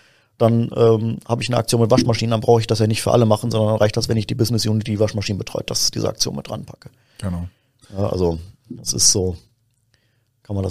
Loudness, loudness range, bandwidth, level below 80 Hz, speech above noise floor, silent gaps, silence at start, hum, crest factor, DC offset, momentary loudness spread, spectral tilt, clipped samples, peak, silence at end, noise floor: -19 LUFS; 6 LU; 15.5 kHz; -44 dBFS; 45 dB; none; 0.4 s; none; 18 dB; 0.5%; 14 LU; -4.5 dB/octave; under 0.1%; 0 dBFS; 0 s; -64 dBFS